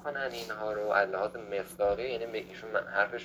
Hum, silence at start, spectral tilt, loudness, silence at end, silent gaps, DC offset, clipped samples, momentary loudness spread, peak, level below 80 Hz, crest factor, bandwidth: none; 0 s; -4 dB/octave; -32 LUFS; 0 s; none; under 0.1%; under 0.1%; 9 LU; -12 dBFS; -60 dBFS; 20 dB; over 20 kHz